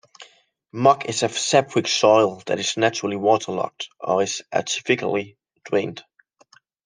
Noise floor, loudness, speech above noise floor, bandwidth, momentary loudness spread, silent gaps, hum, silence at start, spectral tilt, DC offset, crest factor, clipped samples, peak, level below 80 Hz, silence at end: -57 dBFS; -21 LUFS; 36 dB; 10.5 kHz; 11 LU; none; none; 0.2 s; -3.5 dB/octave; under 0.1%; 20 dB; under 0.1%; -2 dBFS; -70 dBFS; 0.85 s